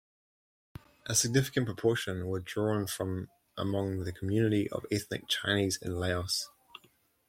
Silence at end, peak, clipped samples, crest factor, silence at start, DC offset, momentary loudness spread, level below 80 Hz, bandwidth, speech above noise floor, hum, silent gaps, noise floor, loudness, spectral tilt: 0.8 s; -12 dBFS; under 0.1%; 20 dB; 1.05 s; under 0.1%; 8 LU; -62 dBFS; 16.5 kHz; 36 dB; none; none; -67 dBFS; -32 LUFS; -4 dB/octave